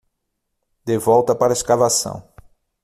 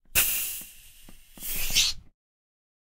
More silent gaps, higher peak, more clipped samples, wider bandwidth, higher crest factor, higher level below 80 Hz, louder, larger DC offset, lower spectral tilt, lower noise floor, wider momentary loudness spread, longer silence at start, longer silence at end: neither; first, -2 dBFS vs -6 dBFS; neither; about the same, 15 kHz vs 16 kHz; second, 18 dB vs 24 dB; second, -52 dBFS vs -42 dBFS; first, -17 LUFS vs -25 LUFS; neither; first, -4 dB/octave vs 1 dB/octave; first, -75 dBFS vs -49 dBFS; about the same, 15 LU vs 17 LU; first, 0.85 s vs 0.1 s; second, 0.6 s vs 1 s